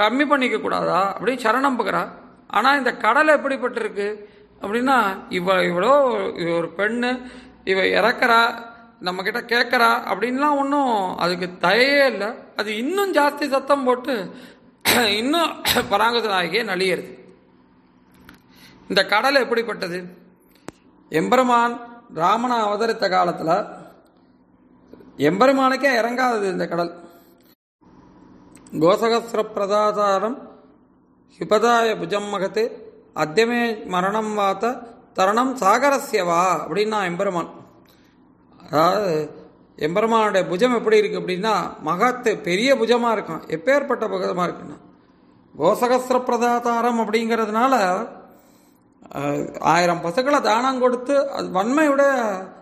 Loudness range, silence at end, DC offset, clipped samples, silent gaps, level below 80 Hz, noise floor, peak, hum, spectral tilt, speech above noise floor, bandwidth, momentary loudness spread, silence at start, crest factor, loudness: 4 LU; 0.05 s; under 0.1%; under 0.1%; 27.55-27.79 s; -62 dBFS; -56 dBFS; -2 dBFS; none; -4 dB/octave; 36 dB; 14.5 kHz; 10 LU; 0 s; 18 dB; -20 LUFS